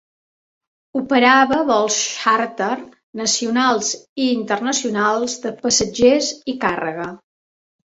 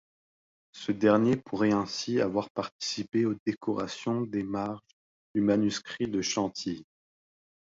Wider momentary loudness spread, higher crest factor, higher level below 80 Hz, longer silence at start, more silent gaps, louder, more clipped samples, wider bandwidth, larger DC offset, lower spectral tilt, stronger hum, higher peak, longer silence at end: about the same, 11 LU vs 11 LU; about the same, 18 dB vs 20 dB; first, -56 dBFS vs -64 dBFS; first, 0.95 s vs 0.75 s; second, 3.03-3.13 s, 4.09-4.16 s vs 2.50-2.55 s, 2.72-2.79 s, 3.40-3.46 s, 4.93-5.34 s; first, -18 LUFS vs -29 LUFS; neither; about the same, 8 kHz vs 7.8 kHz; neither; second, -2 dB/octave vs -5 dB/octave; neither; first, -2 dBFS vs -10 dBFS; about the same, 0.75 s vs 0.8 s